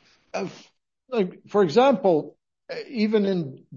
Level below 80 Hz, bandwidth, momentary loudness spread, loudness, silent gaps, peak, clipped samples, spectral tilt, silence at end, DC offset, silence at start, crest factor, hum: -72 dBFS; 7.4 kHz; 17 LU; -23 LUFS; none; -6 dBFS; under 0.1%; -7 dB/octave; 0 s; under 0.1%; 0.35 s; 18 dB; none